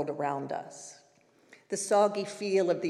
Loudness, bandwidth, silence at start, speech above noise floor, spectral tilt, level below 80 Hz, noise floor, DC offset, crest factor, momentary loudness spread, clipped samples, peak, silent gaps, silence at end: -30 LUFS; 13 kHz; 0 s; 34 dB; -4.5 dB/octave; under -90 dBFS; -64 dBFS; under 0.1%; 18 dB; 19 LU; under 0.1%; -14 dBFS; none; 0 s